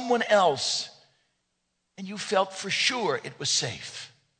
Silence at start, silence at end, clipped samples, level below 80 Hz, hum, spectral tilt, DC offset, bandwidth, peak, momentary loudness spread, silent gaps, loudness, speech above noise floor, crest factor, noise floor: 0 s; 0.35 s; under 0.1%; -74 dBFS; none; -2 dB/octave; under 0.1%; 9.4 kHz; -8 dBFS; 17 LU; none; -25 LUFS; 51 dB; 20 dB; -78 dBFS